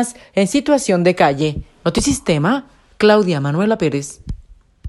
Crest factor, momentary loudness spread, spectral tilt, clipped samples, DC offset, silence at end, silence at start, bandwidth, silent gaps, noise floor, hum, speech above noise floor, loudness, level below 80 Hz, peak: 16 dB; 11 LU; -5 dB/octave; under 0.1%; under 0.1%; 0 s; 0 s; 12.5 kHz; none; -43 dBFS; none; 28 dB; -16 LUFS; -38 dBFS; 0 dBFS